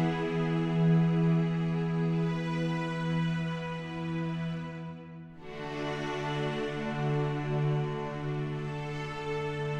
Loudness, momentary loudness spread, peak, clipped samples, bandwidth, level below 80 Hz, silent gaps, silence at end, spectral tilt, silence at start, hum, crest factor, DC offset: -31 LUFS; 11 LU; -18 dBFS; under 0.1%; 7.8 kHz; -58 dBFS; none; 0 s; -8 dB/octave; 0 s; none; 14 dB; under 0.1%